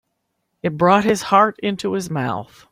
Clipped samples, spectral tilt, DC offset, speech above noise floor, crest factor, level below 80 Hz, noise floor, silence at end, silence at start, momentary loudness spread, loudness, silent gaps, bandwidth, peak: under 0.1%; -5.5 dB/octave; under 0.1%; 55 dB; 18 dB; -56 dBFS; -73 dBFS; 0.3 s; 0.65 s; 11 LU; -18 LUFS; none; 15.5 kHz; -2 dBFS